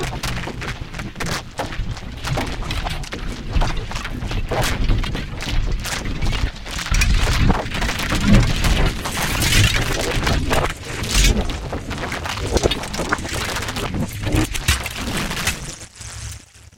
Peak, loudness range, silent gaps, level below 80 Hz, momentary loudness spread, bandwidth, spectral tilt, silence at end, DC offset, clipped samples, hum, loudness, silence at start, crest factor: 0 dBFS; 8 LU; none; -24 dBFS; 12 LU; 17 kHz; -4 dB/octave; 0.1 s; under 0.1%; under 0.1%; none; -22 LUFS; 0 s; 20 dB